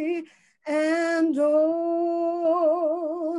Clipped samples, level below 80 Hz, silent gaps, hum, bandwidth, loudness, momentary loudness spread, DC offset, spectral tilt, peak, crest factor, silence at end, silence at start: under 0.1%; -80 dBFS; none; none; 11 kHz; -24 LUFS; 8 LU; under 0.1%; -4 dB/octave; -12 dBFS; 12 dB; 0 s; 0 s